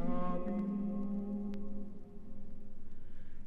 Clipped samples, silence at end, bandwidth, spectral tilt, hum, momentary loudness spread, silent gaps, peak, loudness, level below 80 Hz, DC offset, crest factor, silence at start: under 0.1%; 0 s; 3.2 kHz; -10 dB/octave; none; 19 LU; none; -22 dBFS; -40 LUFS; -46 dBFS; under 0.1%; 12 dB; 0 s